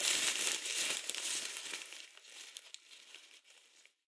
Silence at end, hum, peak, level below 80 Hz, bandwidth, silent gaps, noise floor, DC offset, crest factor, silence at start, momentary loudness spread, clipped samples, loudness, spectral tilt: 0.3 s; none; -12 dBFS; under -90 dBFS; 11 kHz; none; -66 dBFS; under 0.1%; 30 dB; 0 s; 22 LU; under 0.1%; -35 LUFS; 2.5 dB/octave